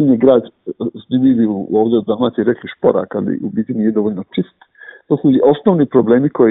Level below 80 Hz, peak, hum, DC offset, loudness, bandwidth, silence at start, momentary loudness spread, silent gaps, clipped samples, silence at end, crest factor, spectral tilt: -56 dBFS; 0 dBFS; none; under 0.1%; -15 LUFS; 4 kHz; 0 s; 11 LU; none; under 0.1%; 0 s; 14 dB; -12.5 dB/octave